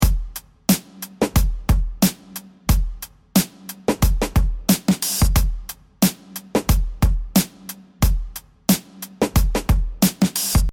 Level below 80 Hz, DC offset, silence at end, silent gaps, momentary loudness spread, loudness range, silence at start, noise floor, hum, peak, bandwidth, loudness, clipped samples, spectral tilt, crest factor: -24 dBFS; under 0.1%; 0 s; none; 16 LU; 2 LU; 0 s; -39 dBFS; none; -4 dBFS; 19 kHz; -21 LUFS; under 0.1%; -5 dB/octave; 14 dB